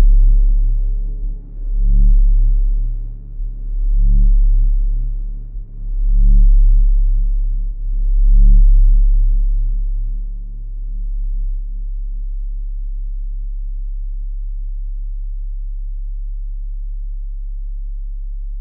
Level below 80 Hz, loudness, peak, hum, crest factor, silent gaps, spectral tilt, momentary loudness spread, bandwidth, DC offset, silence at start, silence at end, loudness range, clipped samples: -14 dBFS; -21 LUFS; -4 dBFS; none; 10 dB; none; -15 dB/octave; 15 LU; 0.5 kHz; under 0.1%; 0 s; 0 s; 12 LU; under 0.1%